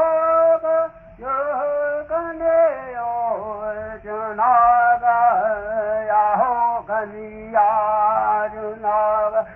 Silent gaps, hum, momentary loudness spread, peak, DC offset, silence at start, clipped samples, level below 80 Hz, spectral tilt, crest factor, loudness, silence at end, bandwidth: none; none; 12 LU; -6 dBFS; under 0.1%; 0 s; under 0.1%; -52 dBFS; -8.5 dB/octave; 14 dB; -19 LUFS; 0 s; 3.1 kHz